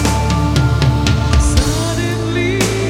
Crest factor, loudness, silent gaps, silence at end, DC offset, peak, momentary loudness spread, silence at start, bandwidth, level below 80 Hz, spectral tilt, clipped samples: 14 dB; -15 LUFS; none; 0 s; under 0.1%; 0 dBFS; 4 LU; 0 s; 16.5 kHz; -20 dBFS; -5 dB/octave; under 0.1%